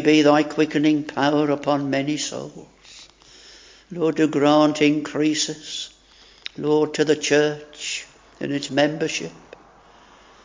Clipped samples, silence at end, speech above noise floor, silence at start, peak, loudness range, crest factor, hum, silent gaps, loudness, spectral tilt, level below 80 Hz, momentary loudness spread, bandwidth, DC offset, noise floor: under 0.1%; 1.05 s; 31 dB; 0 s; -2 dBFS; 4 LU; 20 dB; none; none; -21 LUFS; -4.5 dB/octave; -62 dBFS; 15 LU; 7.6 kHz; under 0.1%; -51 dBFS